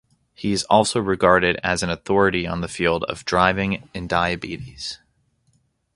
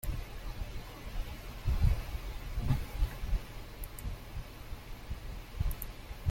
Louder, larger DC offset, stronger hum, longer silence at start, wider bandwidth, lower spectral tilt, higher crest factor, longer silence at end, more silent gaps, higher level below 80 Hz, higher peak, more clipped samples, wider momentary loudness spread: first, -21 LUFS vs -40 LUFS; neither; neither; first, 0.4 s vs 0.05 s; second, 11.5 kHz vs 16.5 kHz; second, -4.5 dB/octave vs -6 dB/octave; about the same, 22 dB vs 20 dB; first, 1 s vs 0 s; neither; second, -44 dBFS vs -38 dBFS; first, 0 dBFS vs -16 dBFS; neither; about the same, 13 LU vs 13 LU